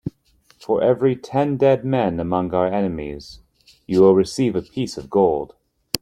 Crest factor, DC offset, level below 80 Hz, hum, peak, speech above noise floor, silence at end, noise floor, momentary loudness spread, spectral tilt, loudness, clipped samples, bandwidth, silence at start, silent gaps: 20 dB; under 0.1%; -50 dBFS; none; 0 dBFS; 39 dB; 0.05 s; -58 dBFS; 15 LU; -6.5 dB/octave; -20 LUFS; under 0.1%; 16.5 kHz; 0.05 s; none